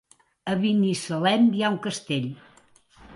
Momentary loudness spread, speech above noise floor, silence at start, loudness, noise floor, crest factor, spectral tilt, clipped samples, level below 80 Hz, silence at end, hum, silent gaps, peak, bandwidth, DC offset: 14 LU; 34 dB; 0.45 s; -24 LUFS; -57 dBFS; 18 dB; -5.5 dB/octave; under 0.1%; -64 dBFS; 0 s; none; none; -8 dBFS; 11.5 kHz; under 0.1%